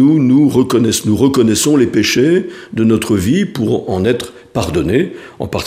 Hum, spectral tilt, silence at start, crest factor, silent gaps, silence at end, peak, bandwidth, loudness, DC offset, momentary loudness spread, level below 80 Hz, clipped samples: none; -5.5 dB/octave; 0 s; 12 dB; none; 0 s; 0 dBFS; 15.5 kHz; -13 LUFS; under 0.1%; 10 LU; -40 dBFS; under 0.1%